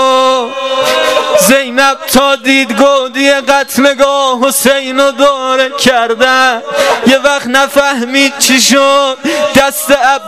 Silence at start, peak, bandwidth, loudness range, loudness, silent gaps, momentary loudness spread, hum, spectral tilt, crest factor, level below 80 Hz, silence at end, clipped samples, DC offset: 0 s; 0 dBFS; 16.5 kHz; 1 LU; -8 LUFS; none; 4 LU; none; -2 dB/octave; 8 dB; -44 dBFS; 0 s; 0.5%; 0.6%